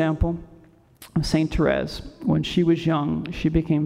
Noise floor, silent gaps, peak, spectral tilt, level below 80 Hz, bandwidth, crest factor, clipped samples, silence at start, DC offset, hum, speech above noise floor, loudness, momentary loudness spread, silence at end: -52 dBFS; none; -6 dBFS; -7 dB/octave; -36 dBFS; 14 kHz; 16 dB; under 0.1%; 0 s; under 0.1%; none; 29 dB; -23 LUFS; 8 LU; 0 s